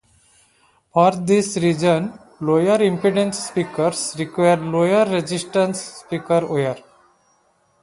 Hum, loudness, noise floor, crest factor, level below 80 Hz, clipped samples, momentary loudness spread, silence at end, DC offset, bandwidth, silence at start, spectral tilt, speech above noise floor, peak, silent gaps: none; -19 LUFS; -61 dBFS; 18 dB; -60 dBFS; under 0.1%; 9 LU; 1 s; under 0.1%; 11.5 kHz; 0.95 s; -5.5 dB/octave; 43 dB; -2 dBFS; none